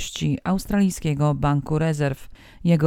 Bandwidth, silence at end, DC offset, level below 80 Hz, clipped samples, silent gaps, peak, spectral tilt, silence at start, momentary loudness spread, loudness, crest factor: 15.5 kHz; 0 s; under 0.1%; -40 dBFS; under 0.1%; none; -6 dBFS; -6.5 dB/octave; 0 s; 5 LU; -23 LUFS; 16 dB